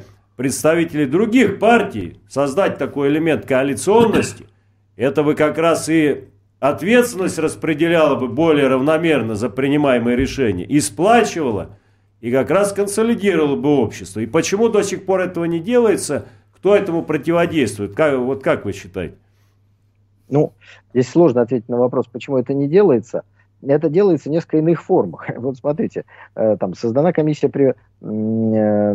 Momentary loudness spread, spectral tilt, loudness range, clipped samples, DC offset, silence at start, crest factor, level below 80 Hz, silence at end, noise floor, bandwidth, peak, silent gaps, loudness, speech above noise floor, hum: 10 LU; -6 dB/octave; 3 LU; under 0.1%; under 0.1%; 0 s; 16 dB; -48 dBFS; 0 s; -57 dBFS; 15.5 kHz; 0 dBFS; none; -17 LUFS; 41 dB; none